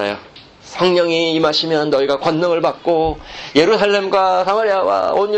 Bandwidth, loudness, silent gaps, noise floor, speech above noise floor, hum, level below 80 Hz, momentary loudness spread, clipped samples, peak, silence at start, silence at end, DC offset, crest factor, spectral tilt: 8.8 kHz; -15 LUFS; none; -41 dBFS; 25 dB; none; -44 dBFS; 5 LU; under 0.1%; 0 dBFS; 0 s; 0 s; under 0.1%; 16 dB; -5 dB/octave